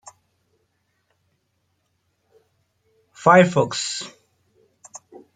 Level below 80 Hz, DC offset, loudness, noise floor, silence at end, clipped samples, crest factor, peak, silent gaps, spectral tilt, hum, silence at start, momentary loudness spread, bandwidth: -68 dBFS; under 0.1%; -18 LUFS; -71 dBFS; 0.4 s; under 0.1%; 24 dB; -2 dBFS; none; -4.5 dB/octave; none; 3.2 s; 28 LU; 9.6 kHz